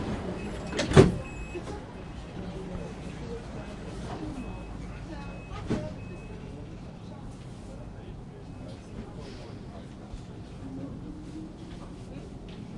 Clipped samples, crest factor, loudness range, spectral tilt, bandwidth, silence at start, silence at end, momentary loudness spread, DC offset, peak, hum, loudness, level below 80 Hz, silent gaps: under 0.1%; 32 dB; 14 LU; -6.5 dB/octave; 11.5 kHz; 0 s; 0 s; 10 LU; under 0.1%; -2 dBFS; none; -34 LUFS; -44 dBFS; none